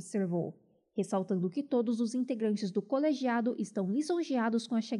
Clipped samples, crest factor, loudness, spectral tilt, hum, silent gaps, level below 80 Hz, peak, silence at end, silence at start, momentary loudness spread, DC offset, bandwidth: under 0.1%; 14 dB; -33 LUFS; -6.5 dB/octave; none; none; -88 dBFS; -18 dBFS; 0 s; 0 s; 4 LU; under 0.1%; 11 kHz